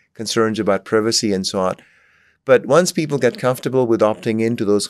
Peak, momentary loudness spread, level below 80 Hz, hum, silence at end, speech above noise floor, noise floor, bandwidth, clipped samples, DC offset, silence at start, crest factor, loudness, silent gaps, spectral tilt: 0 dBFS; 6 LU; -66 dBFS; none; 0 s; 39 dB; -56 dBFS; 14 kHz; under 0.1%; under 0.1%; 0.2 s; 18 dB; -18 LUFS; none; -4.5 dB/octave